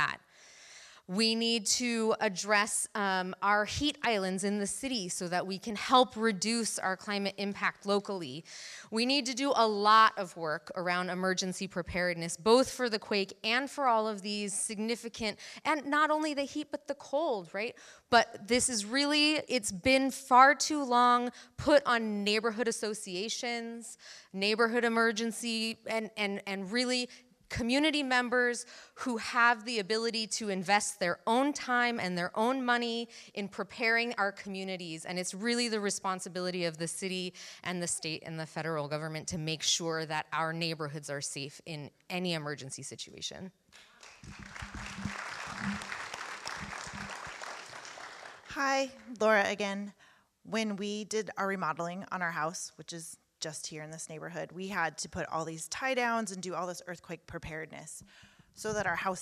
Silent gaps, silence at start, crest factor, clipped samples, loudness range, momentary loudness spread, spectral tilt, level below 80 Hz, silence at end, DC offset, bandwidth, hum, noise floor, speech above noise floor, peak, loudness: none; 0 s; 24 dB; under 0.1%; 11 LU; 15 LU; -3 dB/octave; -64 dBFS; 0 s; under 0.1%; 15 kHz; none; -57 dBFS; 25 dB; -8 dBFS; -31 LUFS